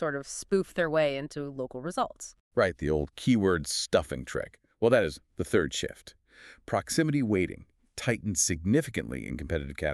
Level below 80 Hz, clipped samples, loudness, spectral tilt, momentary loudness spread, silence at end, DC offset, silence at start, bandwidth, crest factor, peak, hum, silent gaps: -48 dBFS; under 0.1%; -29 LUFS; -4.5 dB/octave; 12 LU; 0 s; under 0.1%; 0 s; 13.5 kHz; 20 dB; -10 dBFS; none; 2.40-2.51 s